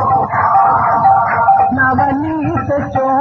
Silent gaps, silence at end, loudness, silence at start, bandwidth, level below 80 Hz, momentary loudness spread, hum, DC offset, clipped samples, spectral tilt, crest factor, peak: none; 0 s; -12 LUFS; 0 s; 6.2 kHz; -40 dBFS; 6 LU; none; under 0.1%; under 0.1%; -9 dB/octave; 10 dB; -2 dBFS